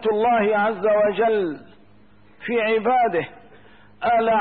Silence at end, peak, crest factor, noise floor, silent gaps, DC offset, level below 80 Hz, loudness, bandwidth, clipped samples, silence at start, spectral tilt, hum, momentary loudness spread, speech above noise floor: 0 s; -10 dBFS; 12 dB; -54 dBFS; none; 0.3%; -62 dBFS; -20 LUFS; 4.6 kHz; under 0.1%; 0 s; -10 dB/octave; none; 10 LU; 34 dB